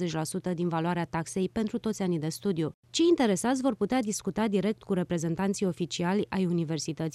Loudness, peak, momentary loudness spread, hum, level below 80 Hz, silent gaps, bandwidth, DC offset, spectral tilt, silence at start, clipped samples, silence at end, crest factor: -29 LUFS; -12 dBFS; 6 LU; none; -60 dBFS; 2.74-2.83 s; 13.5 kHz; under 0.1%; -5.5 dB/octave; 0 s; under 0.1%; 0.05 s; 16 dB